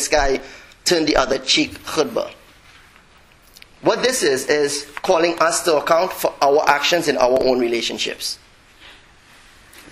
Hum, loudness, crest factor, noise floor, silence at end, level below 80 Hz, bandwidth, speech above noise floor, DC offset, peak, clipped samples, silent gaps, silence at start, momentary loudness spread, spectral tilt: none; -18 LUFS; 20 dB; -50 dBFS; 0.1 s; -40 dBFS; 16 kHz; 32 dB; under 0.1%; 0 dBFS; under 0.1%; none; 0 s; 8 LU; -2.5 dB/octave